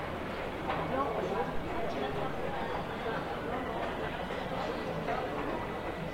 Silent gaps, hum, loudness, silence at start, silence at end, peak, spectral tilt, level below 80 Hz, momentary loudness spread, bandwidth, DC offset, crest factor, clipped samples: none; none; -35 LUFS; 0 s; 0 s; -20 dBFS; -6 dB/octave; -50 dBFS; 4 LU; 16 kHz; under 0.1%; 16 dB; under 0.1%